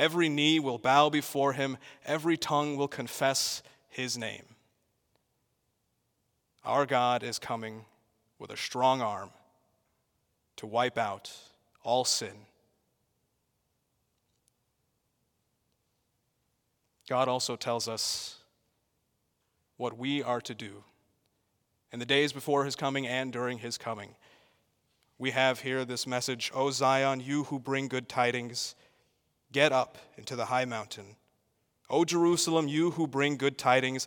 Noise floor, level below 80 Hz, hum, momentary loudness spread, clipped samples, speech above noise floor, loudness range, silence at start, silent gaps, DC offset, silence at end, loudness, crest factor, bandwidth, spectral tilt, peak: -78 dBFS; -78 dBFS; none; 16 LU; under 0.1%; 48 dB; 6 LU; 0 s; none; under 0.1%; 0 s; -30 LUFS; 24 dB; 18 kHz; -3.5 dB/octave; -8 dBFS